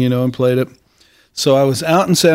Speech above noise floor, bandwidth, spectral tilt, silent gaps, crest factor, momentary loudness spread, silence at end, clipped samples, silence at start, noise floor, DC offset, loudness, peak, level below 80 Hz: 39 dB; 16 kHz; -5 dB/octave; none; 14 dB; 9 LU; 0 s; under 0.1%; 0 s; -53 dBFS; under 0.1%; -15 LUFS; 0 dBFS; -54 dBFS